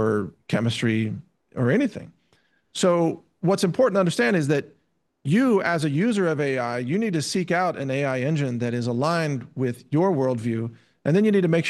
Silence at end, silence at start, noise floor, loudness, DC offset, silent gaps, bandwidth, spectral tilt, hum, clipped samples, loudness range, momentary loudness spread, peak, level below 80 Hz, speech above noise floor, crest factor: 0 s; 0 s; -65 dBFS; -23 LUFS; under 0.1%; none; 12.5 kHz; -6 dB/octave; none; under 0.1%; 3 LU; 8 LU; -8 dBFS; -68 dBFS; 43 dB; 14 dB